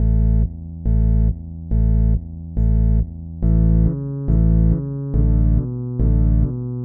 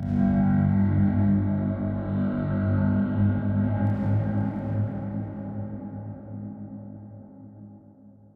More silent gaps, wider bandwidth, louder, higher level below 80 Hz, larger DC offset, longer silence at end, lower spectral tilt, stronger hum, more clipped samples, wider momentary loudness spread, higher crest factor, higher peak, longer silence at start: neither; second, 1.8 kHz vs 3.7 kHz; first, -19 LUFS vs -25 LUFS; first, -18 dBFS vs -46 dBFS; neither; second, 0 s vs 0.25 s; first, -15 dB/octave vs -12 dB/octave; neither; neither; second, 8 LU vs 18 LU; about the same, 10 dB vs 14 dB; first, -6 dBFS vs -12 dBFS; about the same, 0 s vs 0 s